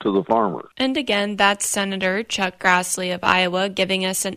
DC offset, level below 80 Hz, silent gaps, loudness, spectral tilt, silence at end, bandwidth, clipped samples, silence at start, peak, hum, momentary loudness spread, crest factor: under 0.1%; -58 dBFS; none; -20 LUFS; -3 dB/octave; 0 s; 16 kHz; under 0.1%; 0 s; -2 dBFS; none; 5 LU; 20 dB